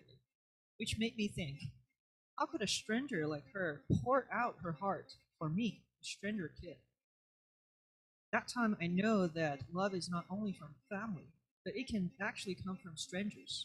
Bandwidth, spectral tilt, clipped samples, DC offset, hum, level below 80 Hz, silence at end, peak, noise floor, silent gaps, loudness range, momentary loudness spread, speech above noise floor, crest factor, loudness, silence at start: 13 kHz; -5 dB/octave; under 0.1%; under 0.1%; none; -66 dBFS; 0 s; -20 dBFS; under -90 dBFS; 1.99-2.37 s, 7.04-8.32 s, 11.51-11.65 s; 5 LU; 13 LU; over 51 dB; 20 dB; -40 LUFS; 0.8 s